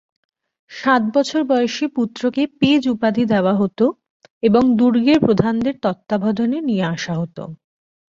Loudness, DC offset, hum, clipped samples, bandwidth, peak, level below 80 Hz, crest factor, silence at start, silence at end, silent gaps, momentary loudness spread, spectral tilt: -18 LUFS; under 0.1%; none; under 0.1%; 7.8 kHz; -2 dBFS; -54 dBFS; 16 dB; 0.7 s; 0.65 s; 4.10-4.20 s, 4.30-4.41 s; 9 LU; -6.5 dB/octave